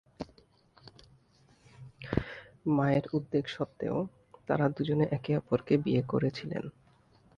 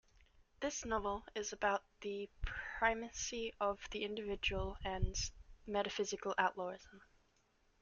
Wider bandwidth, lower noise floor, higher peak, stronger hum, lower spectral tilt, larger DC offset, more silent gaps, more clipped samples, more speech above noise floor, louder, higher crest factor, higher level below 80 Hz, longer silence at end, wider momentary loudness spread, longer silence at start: about the same, 7.2 kHz vs 7.4 kHz; second, -64 dBFS vs -75 dBFS; first, -10 dBFS vs -18 dBFS; neither; first, -8.5 dB/octave vs -3 dB/octave; neither; neither; neither; about the same, 34 dB vs 35 dB; first, -31 LUFS vs -40 LUFS; about the same, 22 dB vs 22 dB; about the same, -56 dBFS vs -52 dBFS; about the same, 0.7 s vs 0.8 s; first, 18 LU vs 9 LU; second, 0.2 s vs 0.6 s